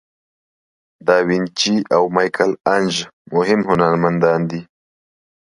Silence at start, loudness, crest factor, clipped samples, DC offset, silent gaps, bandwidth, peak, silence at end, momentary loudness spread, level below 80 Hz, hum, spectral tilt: 1.05 s; -17 LUFS; 18 dB; under 0.1%; under 0.1%; 3.13-3.25 s; 11.5 kHz; 0 dBFS; 0.85 s; 7 LU; -56 dBFS; none; -5 dB/octave